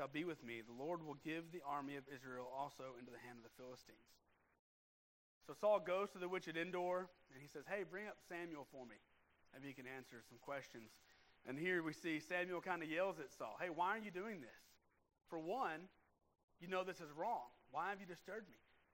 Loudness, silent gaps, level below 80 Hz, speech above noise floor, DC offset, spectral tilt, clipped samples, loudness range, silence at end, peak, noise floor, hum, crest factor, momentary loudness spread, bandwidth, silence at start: -47 LUFS; 4.59-5.41 s, 16.43-16.48 s; -84 dBFS; over 43 dB; under 0.1%; -5 dB/octave; under 0.1%; 9 LU; 0.35 s; -28 dBFS; under -90 dBFS; none; 20 dB; 18 LU; 16 kHz; 0 s